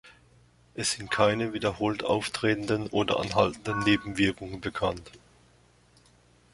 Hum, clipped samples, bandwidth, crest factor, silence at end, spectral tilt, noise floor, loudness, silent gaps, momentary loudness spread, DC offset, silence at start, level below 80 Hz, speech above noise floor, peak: 60 Hz at -55 dBFS; under 0.1%; 11.5 kHz; 22 dB; 1.35 s; -4.5 dB/octave; -61 dBFS; -28 LUFS; none; 6 LU; under 0.1%; 0.05 s; -54 dBFS; 33 dB; -8 dBFS